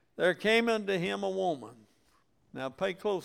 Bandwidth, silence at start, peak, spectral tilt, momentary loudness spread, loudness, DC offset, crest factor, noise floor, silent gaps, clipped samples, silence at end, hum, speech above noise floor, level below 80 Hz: 16 kHz; 0.2 s; -14 dBFS; -5 dB/octave; 14 LU; -31 LUFS; under 0.1%; 18 dB; -70 dBFS; none; under 0.1%; 0 s; none; 40 dB; -68 dBFS